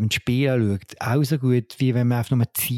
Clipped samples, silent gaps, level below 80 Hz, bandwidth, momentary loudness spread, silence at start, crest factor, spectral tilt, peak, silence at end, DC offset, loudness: under 0.1%; none; -54 dBFS; 17 kHz; 4 LU; 0 s; 12 dB; -6 dB/octave; -8 dBFS; 0 s; under 0.1%; -22 LUFS